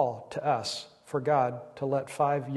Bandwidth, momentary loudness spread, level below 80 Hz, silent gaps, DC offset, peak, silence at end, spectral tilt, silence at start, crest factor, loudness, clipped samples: 12.5 kHz; 9 LU; -72 dBFS; none; under 0.1%; -12 dBFS; 0 s; -5.5 dB/octave; 0 s; 18 dB; -30 LUFS; under 0.1%